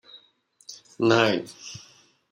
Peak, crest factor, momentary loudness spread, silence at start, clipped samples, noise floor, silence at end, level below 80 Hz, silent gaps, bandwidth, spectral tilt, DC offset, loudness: -4 dBFS; 24 dB; 24 LU; 0.7 s; under 0.1%; -61 dBFS; 0.55 s; -70 dBFS; none; 11 kHz; -5 dB/octave; under 0.1%; -22 LUFS